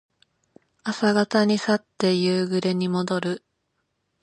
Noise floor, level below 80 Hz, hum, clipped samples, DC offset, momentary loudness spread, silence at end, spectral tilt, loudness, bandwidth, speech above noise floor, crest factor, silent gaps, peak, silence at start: -75 dBFS; -70 dBFS; none; under 0.1%; under 0.1%; 10 LU; 0.85 s; -5.5 dB/octave; -23 LUFS; 11 kHz; 53 dB; 18 dB; none; -6 dBFS; 0.85 s